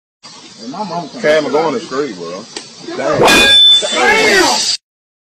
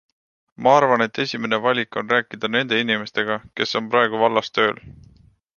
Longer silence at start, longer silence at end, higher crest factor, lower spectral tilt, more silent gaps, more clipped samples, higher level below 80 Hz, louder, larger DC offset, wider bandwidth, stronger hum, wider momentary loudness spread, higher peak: second, 0.25 s vs 0.6 s; about the same, 0.55 s vs 0.65 s; second, 14 dB vs 20 dB; second, -1.5 dB/octave vs -4.5 dB/octave; neither; neither; first, -44 dBFS vs -60 dBFS; first, -9 LUFS vs -20 LUFS; neither; first, 16 kHz vs 7.2 kHz; neither; first, 22 LU vs 8 LU; about the same, 0 dBFS vs -2 dBFS